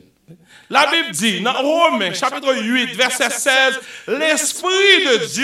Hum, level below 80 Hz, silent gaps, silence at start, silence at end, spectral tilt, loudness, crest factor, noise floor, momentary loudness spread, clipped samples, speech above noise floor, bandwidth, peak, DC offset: none; -68 dBFS; none; 0.3 s; 0 s; -1.5 dB/octave; -15 LUFS; 18 dB; -47 dBFS; 8 LU; under 0.1%; 30 dB; 16 kHz; 0 dBFS; under 0.1%